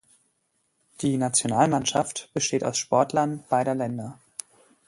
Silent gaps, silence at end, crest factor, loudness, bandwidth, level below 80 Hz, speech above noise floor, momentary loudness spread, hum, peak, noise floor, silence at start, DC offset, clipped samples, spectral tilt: none; 0.75 s; 20 dB; -25 LUFS; 11.5 kHz; -64 dBFS; 48 dB; 15 LU; none; -6 dBFS; -72 dBFS; 1 s; under 0.1%; under 0.1%; -4 dB/octave